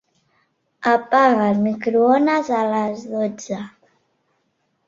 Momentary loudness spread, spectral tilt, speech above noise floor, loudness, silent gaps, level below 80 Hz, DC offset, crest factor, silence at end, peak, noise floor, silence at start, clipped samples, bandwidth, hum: 14 LU; -6 dB/octave; 51 dB; -19 LUFS; none; -66 dBFS; under 0.1%; 18 dB; 1.2 s; -2 dBFS; -69 dBFS; 0.8 s; under 0.1%; 7.6 kHz; none